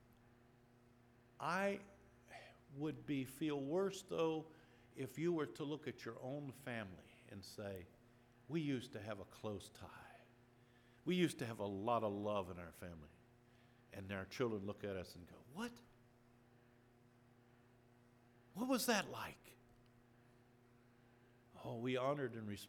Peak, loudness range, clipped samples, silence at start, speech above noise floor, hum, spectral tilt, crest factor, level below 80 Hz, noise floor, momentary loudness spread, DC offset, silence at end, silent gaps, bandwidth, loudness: -24 dBFS; 6 LU; under 0.1%; 1.4 s; 26 dB; none; -5 dB/octave; 22 dB; -78 dBFS; -70 dBFS; 20 LU; under 0.1%; 0 s; none; 19.5 kHz; -44 LUFS